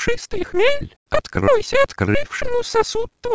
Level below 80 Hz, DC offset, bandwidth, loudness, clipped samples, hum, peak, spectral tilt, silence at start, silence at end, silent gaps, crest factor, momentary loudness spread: -36 dBFS; 4%; 8 kHz; -20 LUFS; under 0.1%; none; -4 dBFS; -4.5 dB/octave; 0 s; 0 s; 0.96-1.06 s; 16 dB; 7 LU